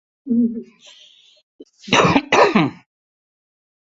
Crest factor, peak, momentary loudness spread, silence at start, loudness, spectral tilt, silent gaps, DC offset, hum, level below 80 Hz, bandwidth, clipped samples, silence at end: 20 dB; 0 dBFS; 9 LU; 0.25 s; -16 LUFS; -4.5 dB/octave; 1.43-1.59 s; under 0.1%; none; -52 dBFS; 8 kHz; under 0.1%; 1.1 s